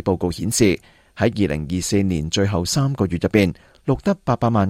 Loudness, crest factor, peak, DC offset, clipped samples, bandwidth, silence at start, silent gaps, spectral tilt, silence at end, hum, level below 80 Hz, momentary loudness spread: -20 LUFS; 18 dB; -2 dBFS; under 0.1%; under 0.1%; 16 kHz; 0.05 s; none; -5.5 dB/octave; 0 s; none; -42 dBFS; 5 LU